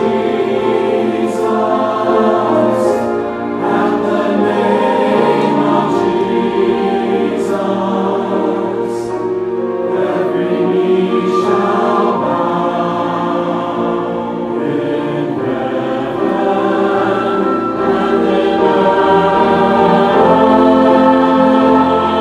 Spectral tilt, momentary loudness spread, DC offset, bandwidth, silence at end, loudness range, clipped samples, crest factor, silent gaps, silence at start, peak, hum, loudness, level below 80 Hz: -7 dB/octave; 8 LU; under 0.1%; 11.5 kHz; 0 s; 6 LU; under 0.1%; 12 dB; none; 0 s; 0 dBFS; none; -13 LUFS; -50 dBFS